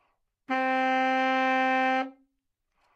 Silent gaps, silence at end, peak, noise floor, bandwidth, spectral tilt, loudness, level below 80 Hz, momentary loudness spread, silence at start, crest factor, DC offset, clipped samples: none; 0.85 s; -14 dBFS; -79 dBFS; 8 kHz; -3 dB/octave; -26 LUFS; -86 dBFS; 7 LU; 0.5 s; 14 dB; under 0.1%; under 0.1%